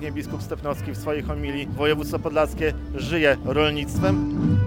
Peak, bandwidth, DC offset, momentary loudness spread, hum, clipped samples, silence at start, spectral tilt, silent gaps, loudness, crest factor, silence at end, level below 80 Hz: -6 dBFS; 17 kHz; under 0.1%; 9 LU; none; under 0.1%; 0 s; -6.5 dB/octave; none; -24 LUFS; 16 dB; 0 s; -36 dBFS